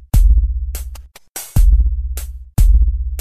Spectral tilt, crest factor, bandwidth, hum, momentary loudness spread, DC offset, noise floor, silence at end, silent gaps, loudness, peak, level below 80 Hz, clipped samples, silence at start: -6 dB/octave; 12 dB; 14 kHz; none; 16 LU; 0.4%; -34 dBFS; 0 s; 1.29-1.35 s; -17 LUFS; -2 dBFS; -14 dBFS; under 0.1%; 0.15 s